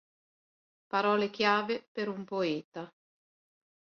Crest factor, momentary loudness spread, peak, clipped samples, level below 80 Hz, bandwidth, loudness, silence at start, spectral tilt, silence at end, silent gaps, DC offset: 20 dB; 16 LU; -14 dBFS; under 0.1%; -78 dBFS; 7 kHz; -31 LUFS; 0.95 s; -5.5 dB/octave; 1.1 s; 1.88-1.95 s, 2.65-2.72 s; under 0.1%